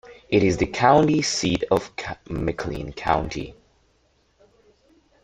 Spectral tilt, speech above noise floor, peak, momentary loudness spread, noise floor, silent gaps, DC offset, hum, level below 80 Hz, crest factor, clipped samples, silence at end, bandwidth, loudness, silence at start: -5 dB/octave; 42 dB; -2 dBFS; 15 LU; -64 dBFS; none; under 0.1%; none; -44 dBFS; 22 dB; under 0.1%; 1.7 s; 11 kHz; -22 LUFS; 0.05 s